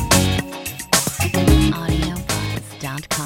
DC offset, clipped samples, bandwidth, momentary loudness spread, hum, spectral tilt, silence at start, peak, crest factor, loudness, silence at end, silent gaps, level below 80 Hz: under 0.1%; under 0.1%; 17 kHz; 13 LU; none; -4 dB/octave; 0 s; 0 dBFS; 18 dB; -19 LUFS; 0 s; none; -26 dBFS